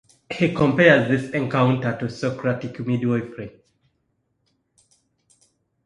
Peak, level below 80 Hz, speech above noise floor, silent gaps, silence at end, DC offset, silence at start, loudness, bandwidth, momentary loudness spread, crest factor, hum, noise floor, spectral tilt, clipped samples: 0 dBFS; -56 dBFS; 51 dB; none; 2.35 s; under 0.1%; 0.3 s; -21 LUFS; 10.5 kHz; 17 LU; 22 dB; none; -71 dBFS; -7 dB/octave; under 0.1%